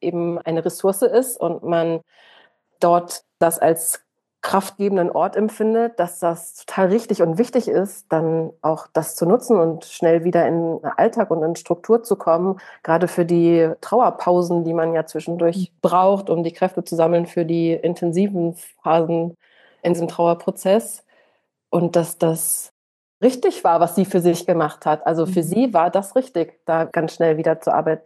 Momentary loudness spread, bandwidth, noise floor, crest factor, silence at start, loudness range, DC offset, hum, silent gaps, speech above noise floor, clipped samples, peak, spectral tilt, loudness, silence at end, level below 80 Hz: 7 LU; 13 kHz; -65 dBFS; 16 dB; 0 s; 3 LU; under 0.1%; none; 22.71-23.21 s; 46 dB; under 0.1%; -4 dBFS; -6 dB/octave; -19 LUFS; 0.05 s; -74 dBFS